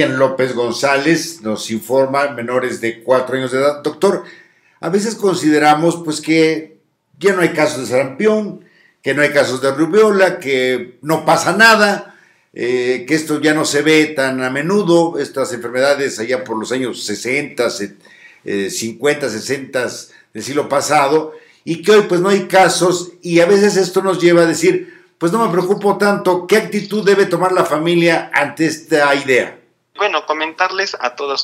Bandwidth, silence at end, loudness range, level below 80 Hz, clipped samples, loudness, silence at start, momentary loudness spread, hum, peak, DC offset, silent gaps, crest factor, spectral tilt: 16 kHz; 0 s; 6 LU; -66 dBFS; under 0.1%; -15 LUFS; 0 s; 10 LU; none; 0 dBFS; under 0.1%; none; 16 dB; -4.5 dB/octave